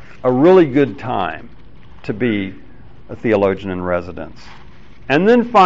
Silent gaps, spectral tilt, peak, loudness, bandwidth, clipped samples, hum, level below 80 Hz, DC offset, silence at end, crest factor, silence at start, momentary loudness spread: none; -5.5 dB/octave; -2 dBFS; -16 LUFS; 7.4 kHz; under 0.1%; none; -46 dBFS; 2%; 0 s; 16 dB; 0.25 s; 22 LU